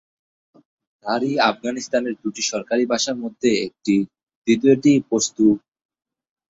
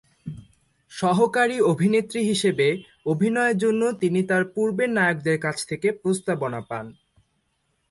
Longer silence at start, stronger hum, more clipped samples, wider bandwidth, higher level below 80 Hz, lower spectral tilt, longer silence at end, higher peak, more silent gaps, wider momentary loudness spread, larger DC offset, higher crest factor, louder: first, 1.05 s vs 0.25 s; neither; neither; second, 8 kHz vs 11.5 kHz; about the same, -62 dBFS vs -62 dBFS; second, -4 dB/octave vs -5.5 dB/octave; about the same, 0.9 s vs 1 s; first, -2 dBFS vs -6 dBFS; first, 4.23-4.27 s, 4.35-4.42 s vs none; second, 10 LU vs 14 LU; neither; about the same, 18 dB vs 16 dB; first, -20 LUFS vs -23 LUFS